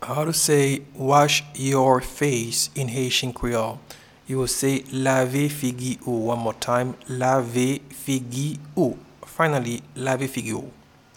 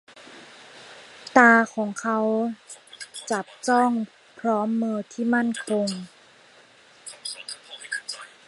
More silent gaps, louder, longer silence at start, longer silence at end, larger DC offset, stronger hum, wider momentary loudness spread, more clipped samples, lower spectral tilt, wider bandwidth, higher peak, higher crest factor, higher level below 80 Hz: neither; about the same, -23 LUFS vs -23 LUFS; second, 0 s vs 0.15 s; first, 0.45 s vs 0.2 s; neither; neither; second, 11 LU vs 25 LU; neither; about the same, -4.5 dB/octave vs -4 dB/octave; first, 18.5 kHz vs 11.5 kHz; about the same, -4 dBFS vs -2 dBFS; about the same, 20 dB vs 24 dB; first, -50 dBFS vs -76 dBFS